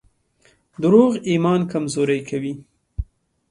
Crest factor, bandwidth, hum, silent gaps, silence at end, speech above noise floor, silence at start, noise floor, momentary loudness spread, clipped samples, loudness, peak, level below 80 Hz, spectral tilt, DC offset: 18 dB; 11.5 kHz; none; none; 0.45 s; 41 dB; 0.8 s; -59 dBFS; 20 LU; under 0.1%; -19 LUFS; -2 dBFS; -42 dBFS; -6.5 dB/octave; under 0.1%